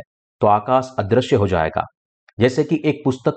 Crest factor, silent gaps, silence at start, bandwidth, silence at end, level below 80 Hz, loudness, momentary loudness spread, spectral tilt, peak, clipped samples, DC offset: 16 dB; 1.97-2.27 s, 2.33-2.37 s; 0.4 s; 8.8 kHz; 0 s; -46 dBFS; -19 LUFS; 5 LU; -7 dB/octave; -4 dBFS; under 0.1%; under 0.1%